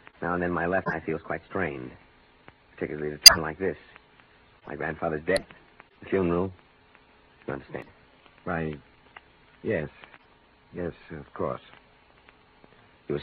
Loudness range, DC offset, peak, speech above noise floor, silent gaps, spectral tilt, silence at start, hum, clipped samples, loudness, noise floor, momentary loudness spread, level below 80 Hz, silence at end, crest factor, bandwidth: 16 LU; under 0.1%; 0 dBFS; 33 dB; none; -1.5 dB/octave; 0.2 s; none; under 0.1%; -23 LUFS; -59 dBFS; 16 LU; -54 dBFS; 0 s; 28 dB; 4.8 kHz